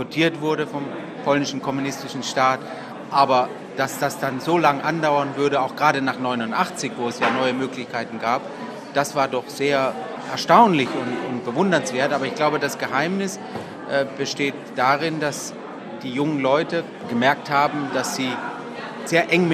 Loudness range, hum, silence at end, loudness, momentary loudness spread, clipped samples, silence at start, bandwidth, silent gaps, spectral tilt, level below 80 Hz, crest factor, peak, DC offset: 4 LU; none; 0 s; -22 LUFS; 10 LU; under 0.1%; 0 s; 14.5 kHz; none; -4.5 dB/octave; -66 dBFS; 22 dB; 0 dBFS; under 0.1%